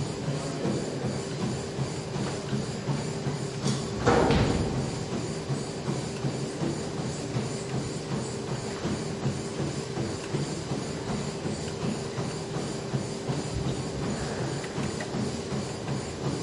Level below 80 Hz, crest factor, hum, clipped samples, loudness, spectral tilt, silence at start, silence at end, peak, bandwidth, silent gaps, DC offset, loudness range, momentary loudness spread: -48 dBFS; 20 dB; none; under 0.1%; -31 LUFS; -5.5 dB/octave; 0 s; 0 s; -10 dBFS; 11.5 kHz; none; under 0.1%; 4 LU; 4 LU